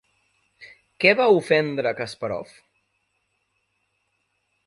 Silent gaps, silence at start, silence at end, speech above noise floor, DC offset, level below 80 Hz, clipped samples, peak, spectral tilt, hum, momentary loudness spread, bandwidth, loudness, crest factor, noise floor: none; 0.6 s; 2.25 s; 52 dB; under 0.1%; -68 dBFS; under 0.1%; -2 dBFS; -5.5 dB/octave; none; 13 LU; 11.5 kHz; -21 LUFS; 24 dB; -73 dBFS